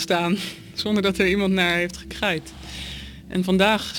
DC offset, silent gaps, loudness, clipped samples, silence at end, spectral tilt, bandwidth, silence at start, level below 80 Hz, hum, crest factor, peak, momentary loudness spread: under 0.1%; none; -22 LUFS; under 0.1%; 0 s; -5 dB/octave; 17.5 kHz; 0 s; -44 dBFS; none; 18 dB; -6 dBFS; 15 LU